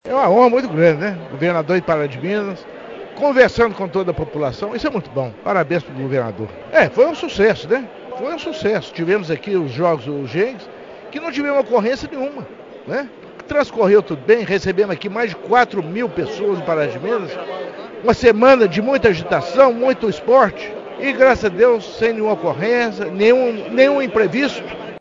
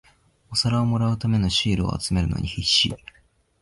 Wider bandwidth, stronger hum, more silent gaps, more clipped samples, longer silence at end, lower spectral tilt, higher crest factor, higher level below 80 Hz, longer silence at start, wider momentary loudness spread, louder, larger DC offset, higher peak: second, 7.6 kHz vs 11.5 kHz; neither; neither; neither; second, 0 s vs 0.65 s; first, -6.5 dB/octave vs -4.5 dB/octave; about the same, 16 dB vs 18 dB; second, -48 dBFS vs -38 dBFS; second, 0.05 s vs 0.5 s; first, 14 LU vs 6 LU; first, -17 LUFS vs -22 LUFS; neither; first, 0 dBFS vs -6 dBFS